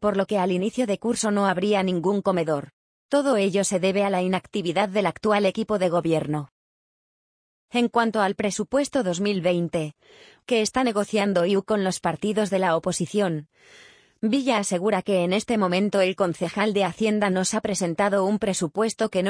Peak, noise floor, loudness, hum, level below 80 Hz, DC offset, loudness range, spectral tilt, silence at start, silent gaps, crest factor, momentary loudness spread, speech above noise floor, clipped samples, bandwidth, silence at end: -6 dBFS; under -90 dBFS; -23 LUFS; none; -60 dBFS; under 0.1%; 2 LU; -5 dB/octave; 0 s; 2.73-3.09 s, 6.52-7.68 s; 18 dB; 4 LU; over 67 dB; under 0.1%; 10.5 kHz; 0 s